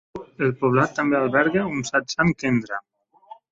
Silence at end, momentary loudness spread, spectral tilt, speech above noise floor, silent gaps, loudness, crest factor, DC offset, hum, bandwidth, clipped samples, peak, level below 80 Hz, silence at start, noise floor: 0.7 s; 8 LU; -6 dB/octave; 26 dB; none; -22 LUFS; 18 dB; under 0.1%; none; 8 kHz; under 0.1%; -4 dBFS; -54 dBFS; 0.15 s; -48 dBFS